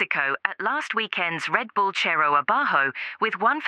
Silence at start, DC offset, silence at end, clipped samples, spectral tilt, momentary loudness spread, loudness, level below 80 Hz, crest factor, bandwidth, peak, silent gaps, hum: 0 s; under 0.1%; 0 s; under 0.1%; -3.5 dB/octave; 6 LU; -23 LUFS; -88 dBFS; 22 dB; 11 kHz; -2 dBFS; none; none